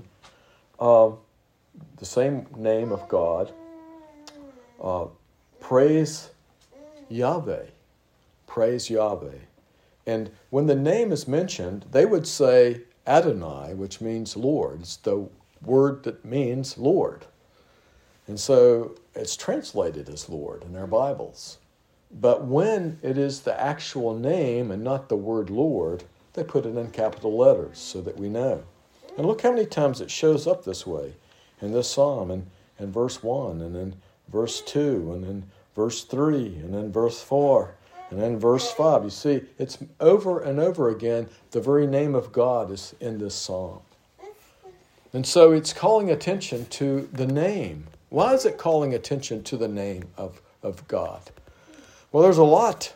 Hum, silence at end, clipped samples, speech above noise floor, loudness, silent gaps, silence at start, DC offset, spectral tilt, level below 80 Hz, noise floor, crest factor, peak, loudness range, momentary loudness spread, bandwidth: none; 0.05 s; under 0.1%; 40 dB; -24 LUFS; none; 0.8 s; under 0.1%; -6 dB/octave; -60 dBFS; -63 dBFS; 24 dB; 0 dBFS; 6 LU; 16 LU; 16 kHz